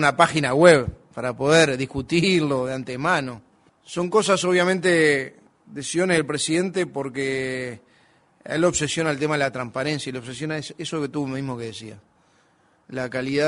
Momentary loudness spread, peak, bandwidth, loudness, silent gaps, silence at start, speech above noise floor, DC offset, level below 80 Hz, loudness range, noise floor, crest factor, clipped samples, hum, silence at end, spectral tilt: 15 LU; 0 dBFS; 11 kHz; -22 LUFS; none; 0 s; 39 dB; under 0.1%; -54 dBFS; 8 LU; -61 dBFS; 22 dB; under 0.1%; none; 0 s; -4.5 dB/octave